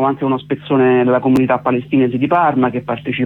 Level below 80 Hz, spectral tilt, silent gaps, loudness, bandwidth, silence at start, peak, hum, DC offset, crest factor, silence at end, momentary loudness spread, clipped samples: -54 dBFS; -8.5 dB/octave; none; -15 LUFS; 5.2 kHz; 0 s; -2 dBFS; none; under 0.1%; 12 dB; 0 s; 7 LU; under 0.1%